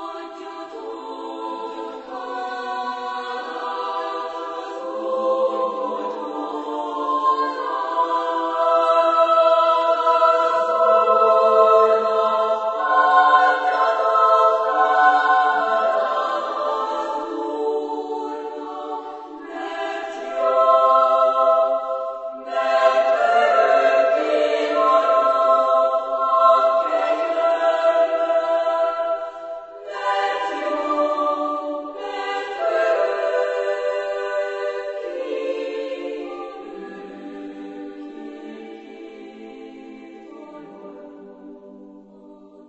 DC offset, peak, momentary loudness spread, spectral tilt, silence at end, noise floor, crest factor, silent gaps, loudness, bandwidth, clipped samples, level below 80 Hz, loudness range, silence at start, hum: under 0.1%; -2 dBFS; 20 LU; -3 dB/octave; 0.05 s; -45 dBFS; 18 dB; none; -19 LUFS; 8.2 kHz; under 0.1%; -70 dBFS; 14 LU; 0 s; none